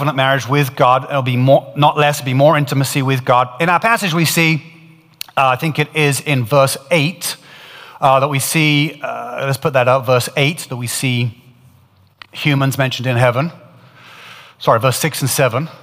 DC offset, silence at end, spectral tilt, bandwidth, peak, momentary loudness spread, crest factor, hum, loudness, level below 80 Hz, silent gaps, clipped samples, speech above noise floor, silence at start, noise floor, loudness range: under 0.1%; 0.05 s; -5 dB/octave; 16 kHz; 0 dBFS; 9 LU; 16 dB; none; -15 LUFS; -60 dBFS; none; under 0.1%; 36 dB; 0 s; -50 dBFS; 5 LU